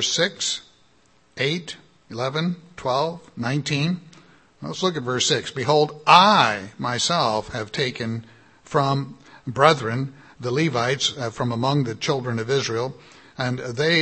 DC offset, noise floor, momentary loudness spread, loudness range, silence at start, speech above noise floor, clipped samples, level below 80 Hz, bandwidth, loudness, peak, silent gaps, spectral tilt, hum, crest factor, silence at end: under 0.1%; -60 dBFS; 14 LU; 7 LU; 0 s; 38 dB; under 0.1%; -60 dBFS; 8.8 kHz; -22 LUFS; 0 dBFS; none; -4 dB/octave; none; 22 dB; 0 s